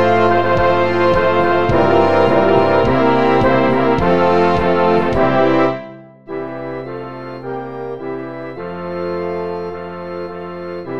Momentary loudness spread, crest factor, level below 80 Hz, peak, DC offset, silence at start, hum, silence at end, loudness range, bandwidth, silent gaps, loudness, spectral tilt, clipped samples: 15 LU; 14 dB; -38 dBFS; 0 dBFS; 4%; 0 s; none; 0 s; 12 LU; 8.2 kHz; none; -15 LUFS; -7.5 dB/octave; under 0.1%